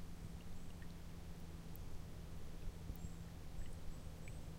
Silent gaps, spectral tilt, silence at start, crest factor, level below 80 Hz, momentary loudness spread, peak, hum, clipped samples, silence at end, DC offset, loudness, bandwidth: none; -6 dB/octave; 0 s; 14 dB; -52 dBFS; 3 LU; -34 dBFS; none; under 0.1%; 0 s; under 0.1%; -54 LUFS; 16 kHz